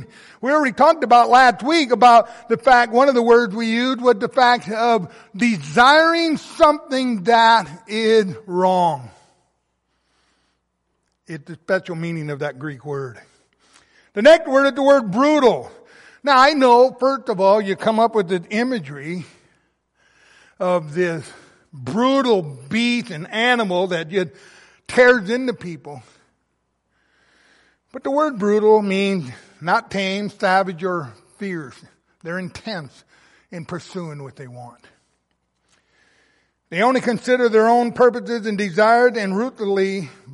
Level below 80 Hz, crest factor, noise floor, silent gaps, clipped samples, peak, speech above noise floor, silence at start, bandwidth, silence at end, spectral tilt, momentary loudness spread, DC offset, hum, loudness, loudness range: -60 dBFS; 16 dB; -71 dBFS; none; under 0.1%; -2 dBFS; 54 dB; 0 s; 11.5 kHz; 0 s; -5 dB/octave; 18 LU; under 0.1%; none; -17 LUFS; 15 LU